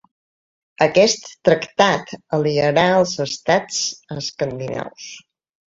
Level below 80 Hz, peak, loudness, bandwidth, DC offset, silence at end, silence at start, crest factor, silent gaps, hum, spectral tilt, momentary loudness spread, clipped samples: -56 dBFS; -2 dBFS; -19 LUFS; 8 kHz; under 0.1%; 0.6 s; 0.8 s; 18 dB; none; none; -4 dB/octave; 13 LU; under 0.1%